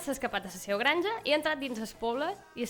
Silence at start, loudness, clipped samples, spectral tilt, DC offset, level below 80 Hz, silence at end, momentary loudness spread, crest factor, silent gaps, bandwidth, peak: 0 s; -31 LUFS; under 0.1%; -3 dB/octave; under 0.1%; -62 dBFS; 0 s; 8 LU; 20 dB; none; over 20 kHz; -12 dBFS